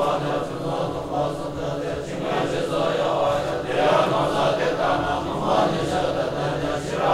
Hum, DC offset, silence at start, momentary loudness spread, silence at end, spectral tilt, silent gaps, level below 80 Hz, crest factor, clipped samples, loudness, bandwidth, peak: none; under 0.1%; 0 s; 7 LU; 0 s; -5.5 dB/octave; none; -46 dBFS; 16 dB; under 0.1%; -23 LUFS; 15.5 kHz; -6 dBFS